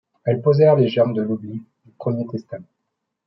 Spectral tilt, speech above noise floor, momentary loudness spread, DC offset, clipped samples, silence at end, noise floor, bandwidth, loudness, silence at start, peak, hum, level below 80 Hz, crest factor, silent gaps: -10 dB/octave; 59 dB; 20 LU; under 0.1%; under 0.1%; 0.65 s; -78 dBFS; 5.8 kHz; -19 LUFS; 0.25 s; -4 dBFS; none; -66 dBFS; 16 dB; none